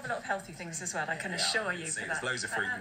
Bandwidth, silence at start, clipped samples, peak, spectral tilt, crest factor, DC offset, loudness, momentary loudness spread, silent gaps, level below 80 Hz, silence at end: 16 kHz; 0 s; under 0.1%; -16 dBFS; -2 dB/octave; 18 dB; under 0.1%; -32 LUFS; 7 LU; none; -66 dBFS; 0 s